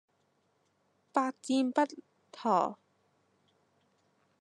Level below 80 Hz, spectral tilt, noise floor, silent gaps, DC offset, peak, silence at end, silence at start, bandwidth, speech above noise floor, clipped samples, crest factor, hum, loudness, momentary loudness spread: under -90 dBFS; -4.5 dB/octave; -74 dBFS; none; under 0.1%; -12 dBFS; 1.65 s; 1.15 s; 11 kHz; 44 dB; under 0.1%; 24 dB; none; -32 LUFS; 6 LU